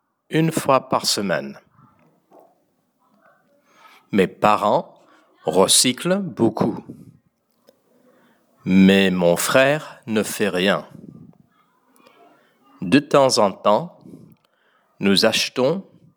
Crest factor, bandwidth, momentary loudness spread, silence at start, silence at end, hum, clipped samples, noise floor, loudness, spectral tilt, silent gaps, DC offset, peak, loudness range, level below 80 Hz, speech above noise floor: 20 dB; over 20 kHz; 11 LU; 0.3 s; 0.35 s; none; under 0.1%; -66 dBFS; -18 LUFS; -4 dB/octave; none; under 0.1%; 0 dBFS; 6 LU; -64 dBFS; 47 dB